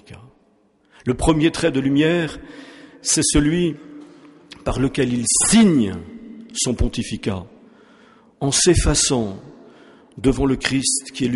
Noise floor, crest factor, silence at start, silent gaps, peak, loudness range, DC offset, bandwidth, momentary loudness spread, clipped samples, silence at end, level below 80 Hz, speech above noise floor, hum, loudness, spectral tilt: -59 dBFS; 16 dB; 0.1 s; none; -4 dBFS; 3 LU; under 0.1%; 11.5 kHz; 16 LU; under 0.1%; 0 s; -34 dBFS; 40 dB; none; -19 LUFS; -4 dB/octave